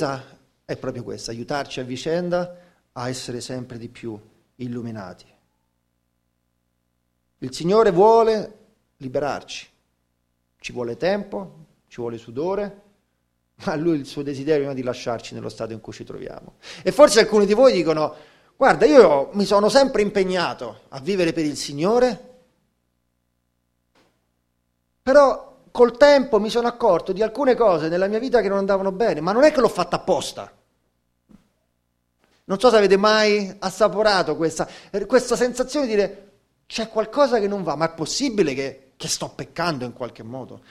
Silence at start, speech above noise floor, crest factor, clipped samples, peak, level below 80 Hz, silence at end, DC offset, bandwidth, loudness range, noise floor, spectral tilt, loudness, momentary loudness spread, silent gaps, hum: 0 s; 52 dB; 22 dB; under 0.1%; 0 dBFS; -52 dBFS; 0.15 s; under 0.1%; 13.5 kHz; 11 LU; -71 dBFS; -4.5 dB/octave; -20 LUFS; 19 LU; none; 60 Hz at -55 dBFS